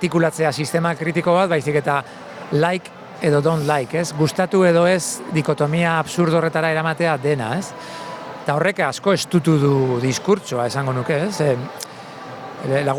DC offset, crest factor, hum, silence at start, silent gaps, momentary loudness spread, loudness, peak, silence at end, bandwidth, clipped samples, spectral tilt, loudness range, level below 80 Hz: under 0.1%; 16 dB; none; 0 s; none; 15 LU; -19 LUFS; -4 dBFS; 0 s; 18 kHz; under 0.1%; -5.5 dB/octave; 2 LU; -60 dBFS